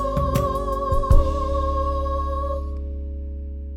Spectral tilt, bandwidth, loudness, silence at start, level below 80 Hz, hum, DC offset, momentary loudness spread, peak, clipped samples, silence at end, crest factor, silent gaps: -7.5 dB/octave; 16.5 kHz; -24 LUFS; 0 s; -24 dBFS; none; under 0.1%; 12 LU; -2 dBFS; under 0.1%; 0 s; 18 dB; none